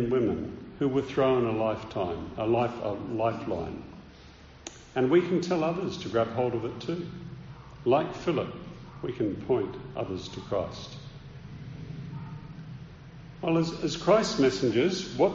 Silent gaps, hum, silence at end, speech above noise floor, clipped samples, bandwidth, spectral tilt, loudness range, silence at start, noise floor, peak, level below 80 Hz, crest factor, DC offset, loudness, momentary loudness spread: none; none; 0 s; 23 dB; under 0.1%; 7.4 kHz; -5.5 dB/octave; 7 LU; 0 s; -50 dBFS; -10 dBFS; -54 dBFS; 20 dB; under 0.1%; -29 LUFS; 20 LU